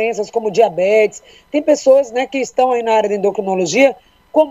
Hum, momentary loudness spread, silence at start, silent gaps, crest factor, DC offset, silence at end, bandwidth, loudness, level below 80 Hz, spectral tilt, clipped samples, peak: none; 7 LU; 0 s; none; 14 dB; under 0.1%; 0 s; 8.2 kHz; -15 LUFS; -58 dBFS; -4 dB/octave; under 0.1%; 0 dBFS